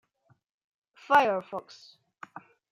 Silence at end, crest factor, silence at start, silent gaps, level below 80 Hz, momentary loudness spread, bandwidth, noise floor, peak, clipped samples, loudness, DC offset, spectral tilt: 0.3 s; 22 dB; 1.1 s; none; -76 dBFS; 26 LU; 15.5 kHz; -49 dBFS; -8 dBFS; under 0.1%; -25 LUFS; under 0.1%; -4.5 dB/octave